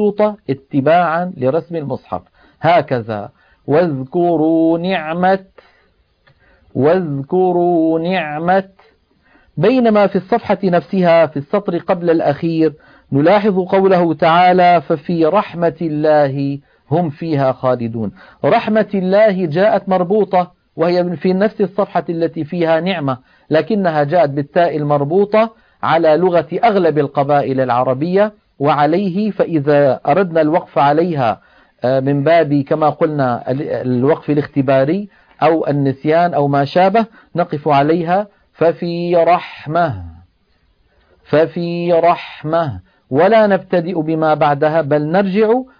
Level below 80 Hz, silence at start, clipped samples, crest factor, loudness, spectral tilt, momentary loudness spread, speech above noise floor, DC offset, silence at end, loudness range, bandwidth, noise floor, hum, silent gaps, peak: -54 dBFS; 0 s; under 0.1%; 14 dB; -15 LUFS; -9.5 dB/octave; 8 LU; 44 dB; under 0.1%; 0.15 s; 4 LU; 5.2 kHz; -58 dBFS; none; none; 0 dBFS